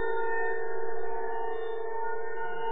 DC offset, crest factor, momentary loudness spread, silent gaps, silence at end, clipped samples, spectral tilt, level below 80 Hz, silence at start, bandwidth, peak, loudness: 4%; 12 dB; 5 LU; none; 0 s; under 0.1%; -7.5 dB/octave; -66 dBFS; 0 s; 3.9 kHz; -18 dBFS; -34 LUFS